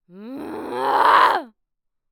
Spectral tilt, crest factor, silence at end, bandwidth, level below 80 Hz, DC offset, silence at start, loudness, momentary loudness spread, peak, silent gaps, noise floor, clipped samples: -3 dB/octave; 18 dB; 0.65 s; over 20 kHz; -68 dBFS; under 0.1%; 0.15 s; -17 LUFS; 20 LU; -4 dBFS; none; -75 dBFS; under 0.1%